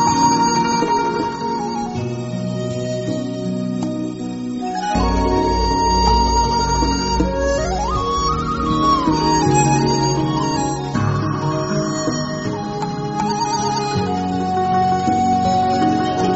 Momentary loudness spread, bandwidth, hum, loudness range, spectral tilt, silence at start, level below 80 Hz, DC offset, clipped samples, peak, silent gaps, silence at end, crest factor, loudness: 9 LU; 8 kHz; none; 5 LU; -5 dB/octave; 0 s; -30 dBFS; under 0.1%; under 0.1%; -2 dBFS; none; 0 s; 16 dB; -18 LUFS